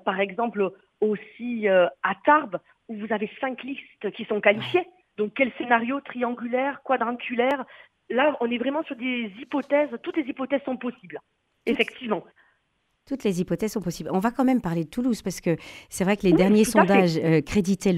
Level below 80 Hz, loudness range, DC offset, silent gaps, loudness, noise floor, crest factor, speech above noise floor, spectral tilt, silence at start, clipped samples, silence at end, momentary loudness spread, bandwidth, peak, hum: -56 dBFS; 7 LU; under 0.1%; none; -25 LUFS; -72 dBFS; 22 dB; 48 dB; -6 dB/octave; 0.05 s; under 0.1%; 0 s; 13 LU; 15 kHz; -2 dBFS; none